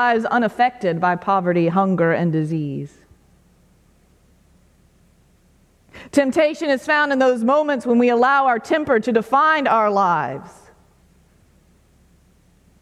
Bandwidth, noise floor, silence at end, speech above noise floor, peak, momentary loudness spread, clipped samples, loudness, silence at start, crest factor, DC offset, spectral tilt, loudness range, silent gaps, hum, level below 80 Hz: 13 kHz; -56 dBFS; 2.3 s; 38 dB; -2 dBFS; 7 LU; under 0.1%; -18 LUFS; 0 s; 18 dB; under 0.1%; -6.5 dB/octave; 9 LU; none; none; -58 dBFS